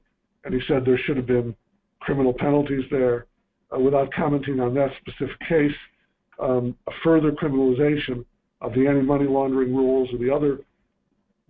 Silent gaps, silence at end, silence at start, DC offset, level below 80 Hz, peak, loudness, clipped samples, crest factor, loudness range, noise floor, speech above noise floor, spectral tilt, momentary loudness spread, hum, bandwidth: none; 0.9 s; 0.45 s; under 0.1%; -48 dBFS; -6 dBFS; -22 LUFS; under 0.1%; 16 dB; 2 LU; -71 dBFS; 49 dB; -11.5 dB/octave; 11 LU; none; 4.3 kHz